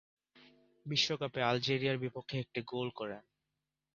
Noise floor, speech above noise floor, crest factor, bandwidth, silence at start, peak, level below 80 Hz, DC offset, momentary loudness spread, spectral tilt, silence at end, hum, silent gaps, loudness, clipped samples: -88 dBFS; 52 dB; 22 dB; 7.2 kHz; 0.35 s; -16 dBFS; -74 dBFS; under 0.1%; 12 LU; -3 dB/octave; 0.75 s; none; none; -35 LUFS; under 0.1%